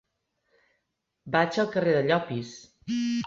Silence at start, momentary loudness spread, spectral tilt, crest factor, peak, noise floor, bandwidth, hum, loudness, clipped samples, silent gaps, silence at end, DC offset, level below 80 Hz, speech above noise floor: 1.25 s; 13 LU; -6 dB/octave; 20 dB; -8 dBFS; -80 dBFS; 7.6 kHz; none; -26 LUFS; under 0.1%; none; 0 s; under 0.1%; -66 dBFS; 54 dB